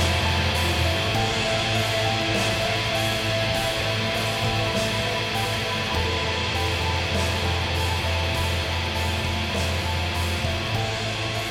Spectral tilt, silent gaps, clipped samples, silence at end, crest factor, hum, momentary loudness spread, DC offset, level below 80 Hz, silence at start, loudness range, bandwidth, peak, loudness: -4 dB/octave; none; under 0.1%; 0 s; 14 dB; none; 3 LU; under 0.1%; -40 dBFS; 0 s; 2 LU; 16.5 kHz; -8 dBFS; -23 LUFS